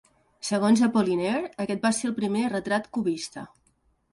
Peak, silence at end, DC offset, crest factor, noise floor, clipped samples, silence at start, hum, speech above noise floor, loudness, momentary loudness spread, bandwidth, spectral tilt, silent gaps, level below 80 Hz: -10 dBFS; 0.65 s; under 0.1%; 16 dB; -67 dBFS; under 0.1%; 0.45 s; none; 42 dB; -26 LUFS; 14 LU; 11.5 kHz; -5 dB/octave; none; -64 dBFS